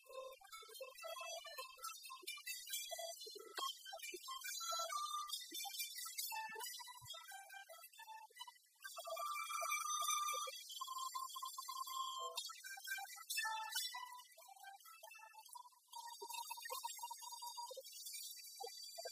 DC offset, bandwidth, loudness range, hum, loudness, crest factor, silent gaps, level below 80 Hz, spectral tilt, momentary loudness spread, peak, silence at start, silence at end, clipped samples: under 0.1%; 15.5 kHz; 7 LU; none; -47 LUFS; 22 dB; none; under -90 dBFS; 2 dB/octave; 15 LU; -26 dBFS; 0 s; 0 s; under 0.1%